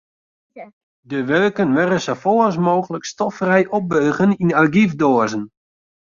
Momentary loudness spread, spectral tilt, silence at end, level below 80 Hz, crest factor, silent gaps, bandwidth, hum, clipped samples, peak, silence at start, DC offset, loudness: 9 LU; -6.5 dB/octave; 0.65 s; -58 dBFS; 16 dB; 0.73-1.03 s; 7.4 kHz; none; under 0.1%; -2 dBFS; 0.55 s; under 0.1%; -17 LUFS